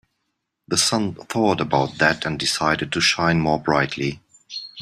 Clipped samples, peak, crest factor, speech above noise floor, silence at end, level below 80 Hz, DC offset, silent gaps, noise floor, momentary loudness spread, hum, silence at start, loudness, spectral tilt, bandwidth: under 0.1%; -2 dBFS; 20 dB; 56 dB; 0 s; -52 dBFS; under 0.1%; none; -76 dBFS; 10 LU; none; 0.7 s; -20 LUFS; -3.5 dB/octave; 15 kHz